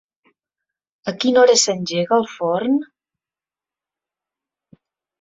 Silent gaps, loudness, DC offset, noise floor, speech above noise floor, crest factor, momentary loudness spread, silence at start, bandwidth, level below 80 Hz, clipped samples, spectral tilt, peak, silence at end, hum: none; -17 LUFS; under 0.1%; under -90 dBFS; over 73 dB; 20 dB; 10 LU; 1.05 s; 8 kHz; -68 dBFS; under 0.1%; -3 dB/octave; -2 dBFS; 2.4 s; none